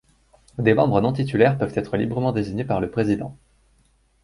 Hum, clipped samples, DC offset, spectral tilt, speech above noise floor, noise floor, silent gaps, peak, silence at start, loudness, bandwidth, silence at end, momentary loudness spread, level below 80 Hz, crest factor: none; under 0.1%; under 0.1%; -8.5 dB/octave; 40 dB; -61 dBFS; none; -2 dBFS; 0.55 s; -22 LUFS; 11.5 kHz; 0.9 s; 7 LU; -48 dBFS; 20 dB